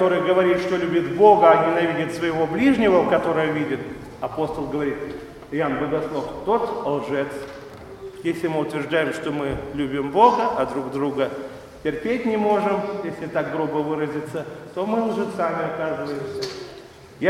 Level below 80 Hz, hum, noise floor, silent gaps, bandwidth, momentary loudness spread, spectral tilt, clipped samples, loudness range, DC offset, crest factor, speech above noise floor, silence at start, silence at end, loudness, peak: -52 dBFS; none; -42 dBFS; none; 14.5 kHz; 15 LU; -6.5 dB/octave; under 0.1%; 8 LU; under 0.1%; 22 dB; 21 dB; 0 s; 0 s; -22 LUFS; 0 dBFS